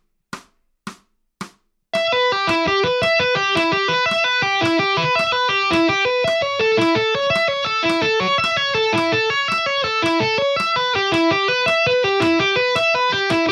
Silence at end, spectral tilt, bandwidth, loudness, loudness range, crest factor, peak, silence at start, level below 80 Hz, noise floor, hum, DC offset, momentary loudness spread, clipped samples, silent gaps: 0 s; -4 dB/octave; 12.5 kHz; -17 LUFS; 2 LU; 12 dB; -6 dBFS; 0.35 s; -54 dBFS; -50 dBFS; none; under 0.1%; 7 LU; under 0.1%; none